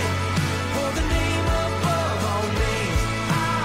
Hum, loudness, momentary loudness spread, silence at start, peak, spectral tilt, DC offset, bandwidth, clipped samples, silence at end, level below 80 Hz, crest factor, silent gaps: none; -23 LUFS; 2 LU; 0 s; -10 dBFS; -5 dB/octave; 0.4%; 16 kHz; under 0.1%; 0 s; -30 dBFS; 12 dB; none